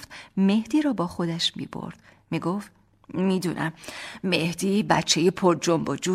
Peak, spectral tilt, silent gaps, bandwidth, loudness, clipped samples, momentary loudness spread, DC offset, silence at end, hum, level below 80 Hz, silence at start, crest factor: -4 dBFS; -4.5 dB/octave; none; 15 kHz; -25 LUFS; under 0.1%; 14 LU; under 0.1%; 0 s; none; -60 dBFS; 0 s; 20 dB